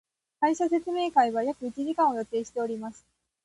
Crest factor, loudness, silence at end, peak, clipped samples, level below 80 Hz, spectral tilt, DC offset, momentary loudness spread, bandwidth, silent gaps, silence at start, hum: 18 dB; -27 LUFS; 0.5 s; -10 dBFS; under 0.1%; -70 dBFS; -4.5 dB/octave; under 0.1%; 9 LU; 11.5 kHz; none; 0.4 s; none